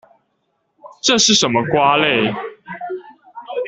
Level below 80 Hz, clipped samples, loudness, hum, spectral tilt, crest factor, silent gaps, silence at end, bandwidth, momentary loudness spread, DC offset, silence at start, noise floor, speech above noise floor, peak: -56 dBFS; under 0.1%; -14 LUFS; none; -2.5 dB/octave; 18 dB; none; 0 s; 8.4 kHz; 19 LU; under 0.1%; 0.85 s; -68 dBFS; 53 dB; 0 dBFS